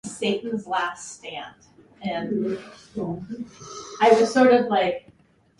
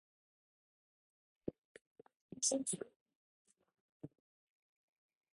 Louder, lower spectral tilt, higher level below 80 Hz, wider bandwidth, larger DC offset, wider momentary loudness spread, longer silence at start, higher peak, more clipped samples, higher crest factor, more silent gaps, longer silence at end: first, -22 LUFS vs -40 LUFS; first, -4.5 dB/octave vs -2.5 dB/octave; first, -62 dBFS vs -84 dBFS; about the same, 11.5 kHz vs 11 kHz; neither; about the same, 20 LU vs 22 LU; second, 0.05 s vs 1.45 s; first, -4 dBFS vs -22 dBFS; neither; second, 20 dB vs 26 dB; second, none vs 1.58-1.75 s, 1.81-1.95 s, 2.16-2.29 s, 2.96-3.06 s, 3.15-3.45 s, 3.80-4.00 s; second, 0.6 s vs 1.35 s